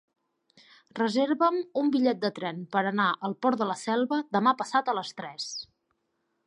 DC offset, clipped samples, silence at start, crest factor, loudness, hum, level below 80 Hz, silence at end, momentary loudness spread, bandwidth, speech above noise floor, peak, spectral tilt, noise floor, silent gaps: under 0.1%; under 0.1%; 0.95 s; 18 dB; -27 LUFS; none; -80 dBFS; 0.8 s; 11 LU; 10.5 kHz; 50 dB; -10 dBFS; -5 dB/octave; -77 dBFS; none